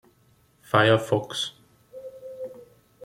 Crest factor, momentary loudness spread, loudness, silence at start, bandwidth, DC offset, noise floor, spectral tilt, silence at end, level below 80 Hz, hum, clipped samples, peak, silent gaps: 22 dB; 22 LU; -23 LUFS; 0.75 s; 16 kHz; under 0.1%; -62 dBFS; -5 dB/octave; 0.45 s; -66 dBFS; none; under 0.1%; -4 dBFS; none